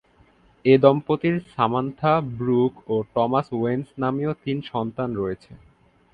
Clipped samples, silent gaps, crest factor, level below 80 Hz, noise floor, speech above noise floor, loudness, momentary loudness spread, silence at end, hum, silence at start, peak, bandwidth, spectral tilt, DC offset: under 0.1%; none; 22 dB; -56 dBFS; -57 dBFS; 35 dB; -23 LUFS; 10 LU; 0.55 s; none; 0.65 s; 0 dBFS; 5 kHz; -9.5 dB/octave; under 0.1%